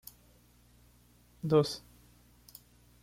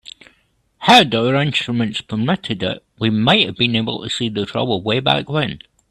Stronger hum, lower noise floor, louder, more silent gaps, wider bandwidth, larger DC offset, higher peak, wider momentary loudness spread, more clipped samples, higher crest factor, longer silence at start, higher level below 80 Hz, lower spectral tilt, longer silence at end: first, 60 Hz at -60 dBFS vs none; about the same, -63 dBFS vs -61 dBFS; second, -31 LUFS vs -17 LUFS; neither; first, 16.5 kHz vs 13.5 kHz; neither; second, -16 dBFS vs 0 dBFS; first, 26 LU vs 11 LU; neither; about the same, 22 dB vs 18 dB; first, 1.45 s vs 0.8 s; second, -64 dBFS vs -52 dBFS; first, -6.5 dB/octave vs -5 dB/octave; first, 1.25 s vs 0.35 s